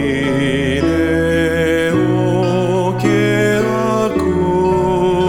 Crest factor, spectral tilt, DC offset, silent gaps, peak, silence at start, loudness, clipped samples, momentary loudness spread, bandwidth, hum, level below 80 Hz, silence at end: 12 dB; -6.5 dB/octave; under 0.1%; none; -2 dBFS; 0 s; -15 LUFS; under 0.1%; 2 LU; 16.5 kHz; none; -34 dBFS; 0 s